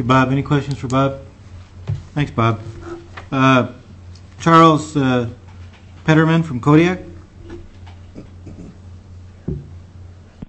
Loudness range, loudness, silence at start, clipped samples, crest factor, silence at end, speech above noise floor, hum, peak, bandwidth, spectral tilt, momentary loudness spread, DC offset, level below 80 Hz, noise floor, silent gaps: 7 LU; -16 LUFS; 0 s; under 0.1%; 18 dB; 0.05 s; 25 dB; none; -2 dBFS; 8.6 kHz; -7 dB/octave; 25 LU; under 0.1%; -44 dBFS; -39 dBFS; none